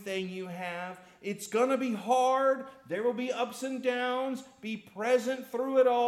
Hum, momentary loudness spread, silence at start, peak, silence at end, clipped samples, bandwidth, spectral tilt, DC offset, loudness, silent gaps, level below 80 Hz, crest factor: none; 13 LU; 0 s; -16 dBFS; 0 s; under 0.1%; 14.5 kHz; -4.5 dB/octave; under 0.1%; -31 LUFS; none; -80 dBFS; 14 dB